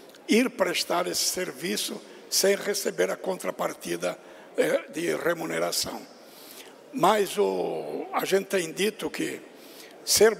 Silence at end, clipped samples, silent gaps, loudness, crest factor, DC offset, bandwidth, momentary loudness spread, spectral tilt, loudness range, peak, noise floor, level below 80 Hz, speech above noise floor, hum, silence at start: 0 s; under 0.1%; none; -27 LUFS; 18 dB; under 0.1%; 16 kHz; 18 LU; -2.5 dB/octave; 3 LU; -8 dBFS; -47 dBFS; -66 dBFS; 20 dB; none; 0.05 s